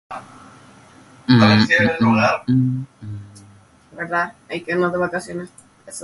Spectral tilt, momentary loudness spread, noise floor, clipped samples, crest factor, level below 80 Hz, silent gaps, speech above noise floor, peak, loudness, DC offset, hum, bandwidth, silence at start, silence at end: -6 dB/octave; 22 LU; -48 dBFS; under 0.1%; 20 dB; -52 dBFS; none; 29 dB; 0 dBFS; -17 LUFS; under 0.1%; none; 11.5 kHz; 0.1 s; 0 s